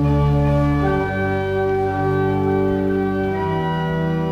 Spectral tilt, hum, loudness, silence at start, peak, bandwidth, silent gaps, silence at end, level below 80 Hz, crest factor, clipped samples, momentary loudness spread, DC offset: -9 dB/octave; none; -19 LUFS; 0 s; -8 dBFS; 7 kHz; none; 0 s; -32 dBFS; 10 dB; under 0.1%; 4 LU; under 0.1%